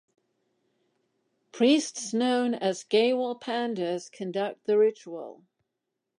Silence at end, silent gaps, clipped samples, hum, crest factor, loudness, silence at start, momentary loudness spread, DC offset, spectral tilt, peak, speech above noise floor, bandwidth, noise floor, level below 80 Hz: 0.85 s; none; under 0.1%; none; 16 dB; -27 LUFS; 1.55 s; 12 LU; under 0.1%; -4 dB/octave; -12 dBFS; 57 dB; 10.5 kHz; -84 dBFS; -84 dBFS